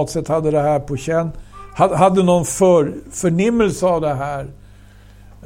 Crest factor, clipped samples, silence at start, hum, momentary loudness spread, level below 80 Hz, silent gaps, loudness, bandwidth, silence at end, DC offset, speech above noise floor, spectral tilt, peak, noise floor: 18 dB; under 0.1%; 0 s; 50 Hz at -45 dBFS; 11 LU; -40 dBFS; none; -17 LUFS; 16.5 kHz; 0 s; under 0.1%; 26 dB; -6 dB/octave; 0 dBFS; -43 dBFS